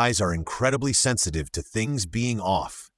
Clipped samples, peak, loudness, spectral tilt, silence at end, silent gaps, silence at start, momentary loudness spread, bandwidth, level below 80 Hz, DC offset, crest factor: under 0.1%; -8 dBFS; -24 LUFS; -3.5 dB/octave; 0.15 s; none; 0 s; 7 LU; 12 kHz; -44 dBFS; under 0.1%; 18 dB